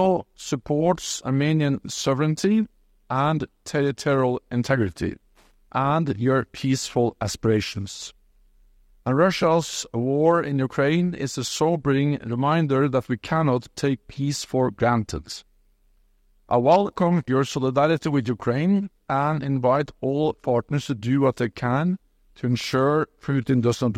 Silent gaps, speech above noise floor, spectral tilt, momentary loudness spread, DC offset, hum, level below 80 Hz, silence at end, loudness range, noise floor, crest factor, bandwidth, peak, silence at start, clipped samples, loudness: none; 38 dB; -6 dB/octave; 7 LU; under 0.1%; none; -54 dBFS; 0 s; 3 LU; -61 dBFS; 18 dB; 15 kHz; -6 dBFS; 0 s; under 0.1%; -23 LUFS